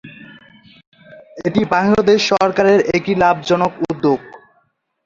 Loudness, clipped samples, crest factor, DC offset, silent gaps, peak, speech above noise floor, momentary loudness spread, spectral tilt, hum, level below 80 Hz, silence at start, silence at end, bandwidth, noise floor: -15 LUFS; under 0.1%; 16 dB; under 0.1%; 0.87-0.92 s; -2 dBFS; 48 dB; 7 LU; -5.5 dB/octave; none; -50 dBFS; 0.05 s; 0.7 s; 7.6 kHz; -62 dBFS